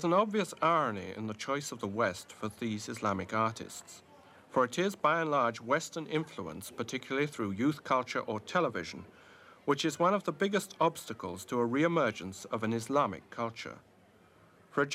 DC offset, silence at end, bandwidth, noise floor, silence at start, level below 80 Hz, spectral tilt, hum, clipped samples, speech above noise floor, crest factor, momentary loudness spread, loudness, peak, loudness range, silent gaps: under 0.1%; 0 s; 16 kHz; -62 dBFS; 0 s; -74 dBFS; -5 dB/octave; none; under 0.1%; 29 dB; 20 dB; 12 LU; -33 LUFS; -14 dBFS; 3 LU; none